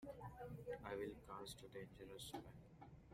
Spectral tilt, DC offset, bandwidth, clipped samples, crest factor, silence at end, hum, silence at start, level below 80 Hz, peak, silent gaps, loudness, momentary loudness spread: -5 dB/octave; under 0.1%; 16 kHz; under 0.1%; 18 dB; 0 s; none; 0 s; -70 dBFS; -36 dBFS; none; -54 LUFS; 13 LU